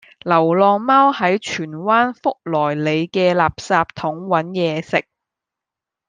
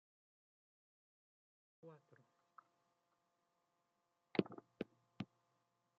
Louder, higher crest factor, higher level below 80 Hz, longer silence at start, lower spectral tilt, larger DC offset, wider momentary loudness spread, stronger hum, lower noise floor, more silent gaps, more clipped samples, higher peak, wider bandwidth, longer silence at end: first, -17 LUFS vs -48 LUFS; second, 16 dB vs 34 dB; first, -54 dBFS vs under -90 dBFS; second, 0.25 s vs 1.85 s; about the same, -6 dB/octave vs -5.5 dB/octave; neither; second, 9 LU vs 26 LU; neither; about the same, -86 dBFS vs -86 dBFS; neither; neither; first, -2 dBFS vs -20 dBFS; first, 9.6 kHz vs 7 kHz; first, 1.05 s vs 0.75 s